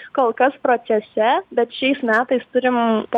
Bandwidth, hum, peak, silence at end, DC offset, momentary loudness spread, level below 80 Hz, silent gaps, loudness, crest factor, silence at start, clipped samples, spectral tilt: 7.4 kHz; none; -6 dBFS; 0 s; under 0.1%; 3 LU; -68 dBFS; none; -19 LUFS; 14 dB; 0 s; under 0.1%; -6.5 dB/octave